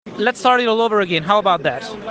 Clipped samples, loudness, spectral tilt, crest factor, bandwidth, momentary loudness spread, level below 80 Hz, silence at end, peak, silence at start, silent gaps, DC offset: under 0.1%; -16 LUFS; -4.5 dB/octave; 16 dB; 9.4 kHz; 6 LU; -58 dBFS; 0 s; -2 dBFS; 0.05 s; none; under 0.1%